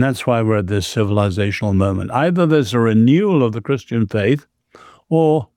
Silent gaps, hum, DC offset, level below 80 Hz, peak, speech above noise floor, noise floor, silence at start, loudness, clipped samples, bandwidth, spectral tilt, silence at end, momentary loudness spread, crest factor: none; none; under 0.1%; -54 dBFS; -4 dBFS; 30 dB; -46 dBFS; 0 s; -17 LUFS; under 0.1%; 15 kHz; -7 dB/octave; 0.15 s; 7 LU; 12 dB